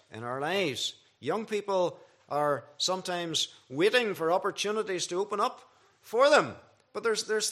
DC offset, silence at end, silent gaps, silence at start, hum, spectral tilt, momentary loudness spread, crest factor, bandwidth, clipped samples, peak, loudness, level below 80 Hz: under 0.1%; 0 s; none; 0.1 s; none; -3 dB/octave; 9 LU; 20 dB; 14.5 kHz; under 0.1%; -10 dBFS; -29 LUFS; -82 dBFS